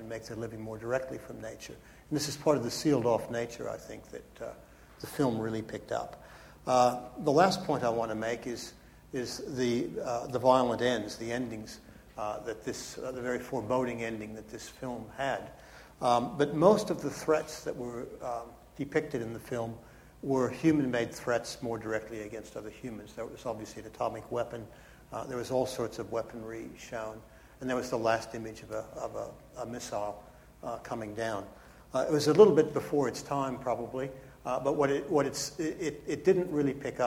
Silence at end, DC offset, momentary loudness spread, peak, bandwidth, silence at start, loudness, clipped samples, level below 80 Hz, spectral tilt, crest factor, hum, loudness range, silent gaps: 0 s; under 0.1%; 17 LU; -8 dBFS; 16.5 kHz; 0 s; -32 LUFS; under 0.1%; -60 dBFS; -5.5 dB/octave; 24 dB; none; 9 LU; none